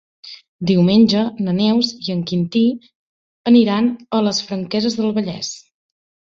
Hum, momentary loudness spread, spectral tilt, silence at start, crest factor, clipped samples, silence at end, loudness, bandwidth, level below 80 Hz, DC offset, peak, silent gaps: none; 14 LU; -6 dB/octave; 0.25 s; 16 dB; under 0.1%; 0.75 s; -17 LUFS; 7.6 kHz; -58 dBFS; under 0.1%; -2 dBFS; 0.48-0.59 s, 2.95-3.44 s